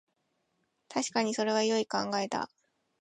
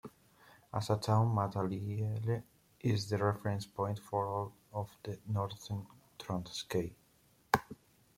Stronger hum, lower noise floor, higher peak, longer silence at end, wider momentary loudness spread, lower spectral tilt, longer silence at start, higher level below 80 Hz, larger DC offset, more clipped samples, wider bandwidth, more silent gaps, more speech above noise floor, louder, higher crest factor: neither; first, -78 dBFS vs -69 dBFS; second, -14 dBFS vs -10 dBFS; about the same, 0.55 s vs 0.45 s; second, 9 LU vs 12 LU; second, -3.5 dB/octave vs -6.5 dB/octave; first, 0.9 s vs 0.05 s; second, -78 dBFS vs -66 dBFS; neither; neither; second, 11.5 kHz vs 16 kHz; neither; first, 48 dB vs 33 dB; first, -31 LUFS vs -37 LUFS; second, 20 dB vs 26 dB